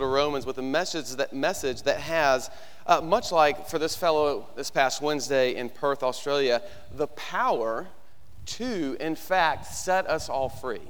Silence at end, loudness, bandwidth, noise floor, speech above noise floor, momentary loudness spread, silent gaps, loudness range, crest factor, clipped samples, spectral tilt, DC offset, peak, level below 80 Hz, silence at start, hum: 0 s; -26 LUFS; over 20 kHz; -50 dBFS; 24 dB; 9 LU; none; 4 LU; 20 dB; under 0.1%; -3.5 dB/octave; 1%; -6 dBFS; -54 dBFS; 0 s; none